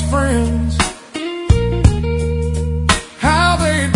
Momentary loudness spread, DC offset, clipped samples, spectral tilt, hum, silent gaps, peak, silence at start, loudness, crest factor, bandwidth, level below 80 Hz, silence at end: 7 LU; under 0.1%; under 0.1%; -5 dB/octave; none; none; 0 dBFS; 0 s; -16 LUFS; 16 dB; 11 kHz; -22 dBFS; 0 s